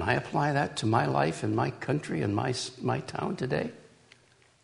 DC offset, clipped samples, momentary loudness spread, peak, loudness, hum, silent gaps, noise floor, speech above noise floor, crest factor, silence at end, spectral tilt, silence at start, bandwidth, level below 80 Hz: under 0.1%; under 0.1%; 6 LU; -10 dBFS; -30 LUFS; none; none; -62 dBFS; 33 dB; 20 dB; 0.8 s; -6 dB/octave; 0 s; 10.5 kHz; -60 dBFS